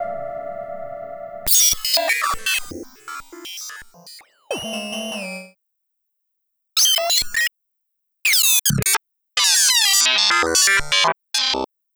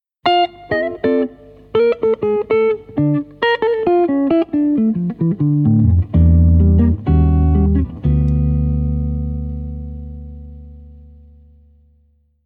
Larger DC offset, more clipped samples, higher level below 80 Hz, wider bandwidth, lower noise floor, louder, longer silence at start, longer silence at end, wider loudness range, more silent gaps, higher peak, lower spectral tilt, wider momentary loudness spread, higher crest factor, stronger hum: neither; neither; second, -48 dBFS vs -26 dBFS; first, over 20 kHz vs 4.6 kHz; first, -75 dBFS vs -57 dBFS; about the same, -16 LUFS vs -16 LUFS; second, 0 s vs 0.25 s; second, 0.3 s vs 1.5 s; first, 16 LU vs 10 LU; neither; about the same, 0 dBFS vs -2 dBFS; second, 0 dB/octave vs -10.5 dB/octave; first, 20 LU vs 13 LU; first, 22 dB vs 14 dB; second, none vs 50 Hz at -45 dBFS